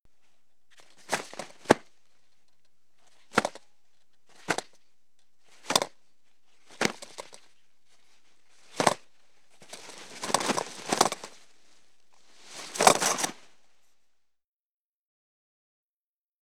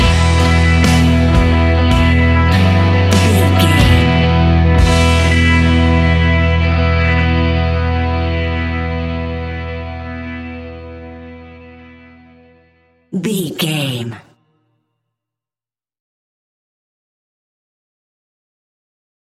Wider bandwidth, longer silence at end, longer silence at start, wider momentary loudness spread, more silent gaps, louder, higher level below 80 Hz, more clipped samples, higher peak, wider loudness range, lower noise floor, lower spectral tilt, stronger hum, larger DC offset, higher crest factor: first, 19.5 kHz vs 13.5 kHz; second, 3.1 s vs 5.2 s; first, 1.1 s vs 0 s; first, 22 LU vs 15 LU; neither; second, -28 LUFS vs -13 LUFS; second, -70 dBFS vs -22 dBFS; neither; second, -4 dBFS vs 0 dBFS; second, 7 LU vs 16 LU; about the same, under -90 dBFS vs under -90 dBFS; second, -2 dB/octave vs -6 dB/octave; neither; first, 0.3% vs under 0.1%; first, 30 dB vs 14 dB